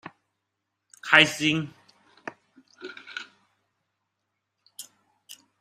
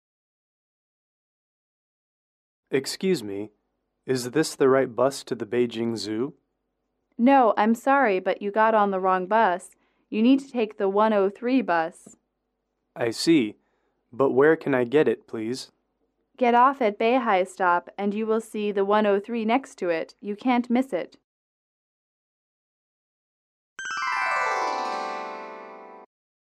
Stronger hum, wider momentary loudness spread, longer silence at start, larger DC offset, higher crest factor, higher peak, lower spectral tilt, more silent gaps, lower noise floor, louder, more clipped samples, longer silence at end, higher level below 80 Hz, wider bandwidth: neither; first, 27 LU vs 12 LU; second, 0.05 s vs 2.7 s; neither; first, 30 dB vs 18 dB; first, 0 dBFS vs -8 dBFS; second, -3 dB/octave vs -5 dB/octave; second, none vs 21.24-23.76 s; about the same, -81 dBFS vs -78 dBFS; first, -20 LUFS vs -24 LUFS; neither; second, 0.25 s vs 0.5 s; first, -70 dBFS vs -76 dBFS; first, 15.5 kHz vs 14 kHz